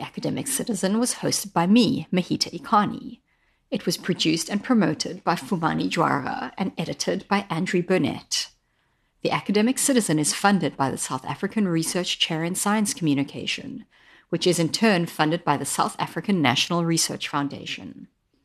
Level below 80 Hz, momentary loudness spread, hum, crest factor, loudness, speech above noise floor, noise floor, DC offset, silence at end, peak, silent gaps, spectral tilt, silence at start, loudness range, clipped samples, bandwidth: -62 dBFS; 9 LU; none; 20 dB; -23 LUFS; 45 dB; -68 dBFS; under 0.1%; 0.4 s; -4 dBFS; none; -4 dB/octave; 0 s; 2 LU; under 0.1%; 13 kHz